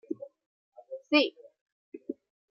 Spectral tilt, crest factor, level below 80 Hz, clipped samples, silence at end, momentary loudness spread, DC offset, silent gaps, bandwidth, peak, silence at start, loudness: 0.5 dB/octave; 24 dB; under -90 dBFS; under 0.1%; 0.4 s; 22 LU; under 0.1%; 0.46-0.72 s, 1.61-1.66 s, 1.72-1.92 s; 5.8 kHz; -10 dBFS; 0.1 s; -28 LUFS